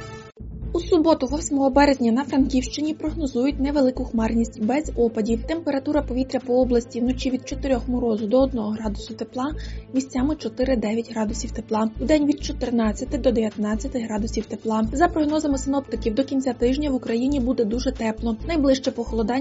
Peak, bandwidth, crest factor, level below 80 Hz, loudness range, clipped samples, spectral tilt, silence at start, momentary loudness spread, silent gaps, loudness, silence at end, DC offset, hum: -4 dBFS; 8 kHz; 18 dB; -36 dBFS; 3 LU; under 0.1%; -5.5 dB/octave; 0 s; 7 LU; none; -23 LUFS; 0 s; under 0.1%; none